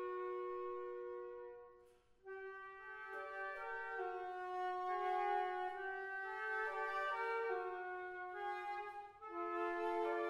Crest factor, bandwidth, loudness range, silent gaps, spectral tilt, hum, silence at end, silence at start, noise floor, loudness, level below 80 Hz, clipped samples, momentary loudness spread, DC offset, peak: 14 dB; 12 kHz; 8 LU; none; -4 dB/octave; none; 0 s; 0 s; -68 dBFS; -44 LUFS; -80 dBFS; under 0.1%; 12 LU; under 0.1%; -30 dBFS